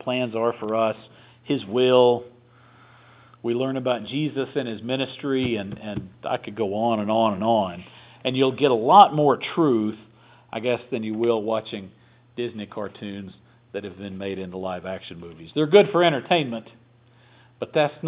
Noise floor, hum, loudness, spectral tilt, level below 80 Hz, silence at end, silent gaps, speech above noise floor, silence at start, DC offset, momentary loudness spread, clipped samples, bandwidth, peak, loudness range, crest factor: -55 dBFS; none; -23 LUFS; -10 dB/octave; -60 dBFS; 0 s; none; 33 dB; 0.05 s; under 0.1%; 18 LU; under 0.1%; 4 kHz; 0 dBFS; 10 LU; 24 dB